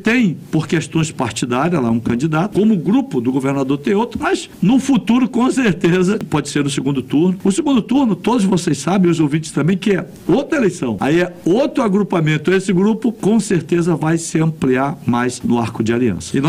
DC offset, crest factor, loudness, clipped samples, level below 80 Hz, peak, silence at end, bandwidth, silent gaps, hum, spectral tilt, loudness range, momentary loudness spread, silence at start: under 0.1%; 12 dB; -16 LUFS; under 0.1%; -48 dBFS; -4 dBFS; 0 s; 15 kHz; none; none; -6 dB/octave; 1 LU; 4 LU; 0 s